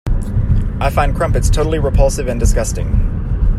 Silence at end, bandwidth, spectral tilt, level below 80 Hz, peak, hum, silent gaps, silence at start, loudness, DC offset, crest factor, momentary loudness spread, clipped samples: 0 s; 13 kHz; -6 dB/octave; -16 dBFS; 0 dBFS; none; none; 0.05 s; -17 LUFS; under 0.1%; 14 dB; 4 LU; under 0.1%